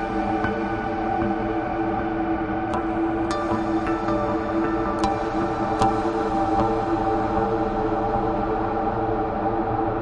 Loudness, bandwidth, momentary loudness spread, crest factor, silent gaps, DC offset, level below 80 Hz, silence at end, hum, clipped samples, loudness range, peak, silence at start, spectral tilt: -24 LUFS; 10 kHz; 3 LU; 18 dB; none; under 0.1%; -38 dBFS; 0 s; none; under 0.1%; 2 LU; -6 dBFS; 0 s; -7.5 dB/octave